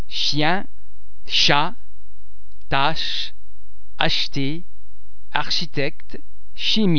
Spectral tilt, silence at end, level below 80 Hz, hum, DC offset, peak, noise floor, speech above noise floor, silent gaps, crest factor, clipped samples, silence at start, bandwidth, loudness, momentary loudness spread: -4 dB/octave; 0 s; -44 dBFS; none; 20%; 0 dBFS; -52 dBFS; 30 dB; none; 26 dB; under 0.1%; 0 s; 5.4 kHz; -21 LUFS; 12 LU